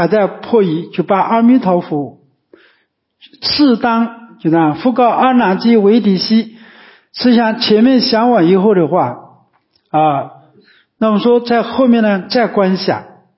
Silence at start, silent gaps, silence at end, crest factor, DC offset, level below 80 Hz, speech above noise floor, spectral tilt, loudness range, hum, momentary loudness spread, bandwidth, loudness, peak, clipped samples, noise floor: 0 s; none; 0.35 s; 12 dB; under 0.1%; -56 dBFS; 49 dB; -9.5 dB/octave; 4 LU; none; 10 LU; 5.8 kHz; -12 LUFS; 0 dBFS; under 0.1%; -61 dBFS